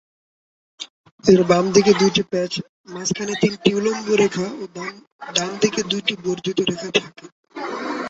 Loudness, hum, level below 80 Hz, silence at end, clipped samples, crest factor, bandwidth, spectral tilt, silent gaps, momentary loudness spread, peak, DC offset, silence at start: -20 LUFS; none; -58 dBFS; 0 s; under 0.1%; 20 dB; 8 kHz; -4.5 dB/octave; 0.90-1.04 s, 1.11-1.18 s, 2.69-2.84 s, 5.07-5.19 s, 7.32-7.43 s; 21 LU; -2 dBFS; under 0.1%; 0.8 s